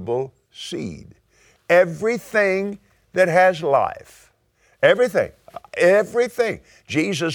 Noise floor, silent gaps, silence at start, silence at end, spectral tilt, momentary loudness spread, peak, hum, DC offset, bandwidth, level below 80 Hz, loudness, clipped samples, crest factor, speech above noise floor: -61 dBFS; none; 0 s; 0 s; -5 dB/octave; 17 LU; 0 dBFS; none; under 0.1%; 19 kHz; -58 dBFS; -19 LUFS; under 0.1%; 20 dB; 42 dB